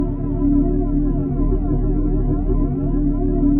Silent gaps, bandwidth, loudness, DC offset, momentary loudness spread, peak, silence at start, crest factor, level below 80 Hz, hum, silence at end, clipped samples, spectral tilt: none; 2 kHz; -20 LUFS; under 0.1%; 3 LU; -6 dBFS; 0 s; 12 dB; -20 dBFS; none; 0 s; under 0.1%; -13.5 dB/octave